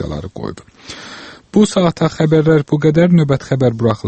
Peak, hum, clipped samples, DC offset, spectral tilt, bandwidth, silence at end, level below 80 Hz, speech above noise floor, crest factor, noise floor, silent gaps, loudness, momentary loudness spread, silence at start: 0 dBFS; none; under 0.1%; under 0.1%; -7 dB/octave; 8.8 kHz; 0 s; -42 dBFS; 21 dB; 14 dB; -35 dBFS; none; -14 LUFS; 19 LU; 0 s